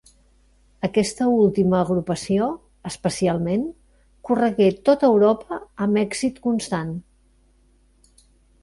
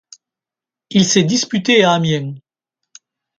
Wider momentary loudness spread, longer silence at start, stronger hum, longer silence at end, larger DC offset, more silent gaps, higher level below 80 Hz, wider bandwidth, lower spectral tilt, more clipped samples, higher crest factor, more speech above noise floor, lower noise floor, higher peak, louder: first, 14 LU vs 8 LU; about the same, 0.85 s vs 0.9 s; neither; first, 1.6 s vs 1 s; neither; neither; first, -52 dBFS vs -58 dBFS; first, 11.5 kHz vs 9.4 kHz; first, -6 dB/octave vs -4 dB/octave; neither; about the same, 16 dB vs 18 dB; second, 38 dB vs 74 dB; second, -58 dBFS vs -88 dBFS; second, -6 dBFS vs 0 dBFS; second, -21 LUFS vs -14 LUFS